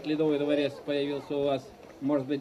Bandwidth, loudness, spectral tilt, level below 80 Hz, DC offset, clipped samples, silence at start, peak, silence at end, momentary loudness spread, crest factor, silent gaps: 11.5 kHz; -30 LUFS; -7 dB/octave; -68 dBFS; under 0.1%; under 0.1%; 0 s; -14 dBFS; 0 s; 7 LU; 14 dB; none